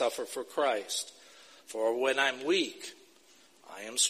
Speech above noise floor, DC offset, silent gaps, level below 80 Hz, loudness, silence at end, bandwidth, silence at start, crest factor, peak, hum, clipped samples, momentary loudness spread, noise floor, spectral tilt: 30 dB; under 0.1%; none; -88 dBFS; -31 LUFS; 0 s; 15.5 kHz; 0 s; 20 dB; -12 dBFS; none; under 0.1%; 17 LU; -61 dBFS; -0.5 dB/octave